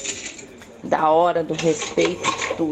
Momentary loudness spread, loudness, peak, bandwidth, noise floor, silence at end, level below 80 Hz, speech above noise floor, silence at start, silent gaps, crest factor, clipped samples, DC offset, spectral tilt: 19 LU; -21 LUFS; -4 dBFS; 10.5 kHz; -41 dBFS; 0 s; -56 dBFS; 21 dB; 0 s; none; 16 dB; under 0.1%; under 0.1%; -3.5 dB/octave